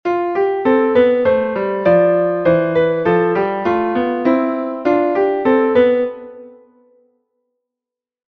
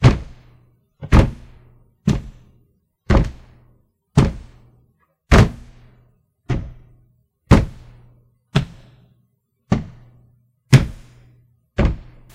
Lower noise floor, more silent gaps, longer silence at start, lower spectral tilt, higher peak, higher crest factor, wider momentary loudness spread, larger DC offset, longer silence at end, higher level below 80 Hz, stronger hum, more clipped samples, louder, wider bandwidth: first, -87 dBFS vs -65 dBFS; neither; about the same, 0.05 s vs 0 s; first, -9 dB/octave vs -7 dB/octave; about the same, -2 dBFS vs 0 dBFS; second, 14 dB vs 20 dB; second, 5 LU vs 23 LU; neither; first, 1.8 s vs 0.3 s; second, -52 dBFS vs -26 dBFS; neither; neither; first, -15 LUFS vs -19 LUFS; second, 5.8 kHz vs 12.5 kHz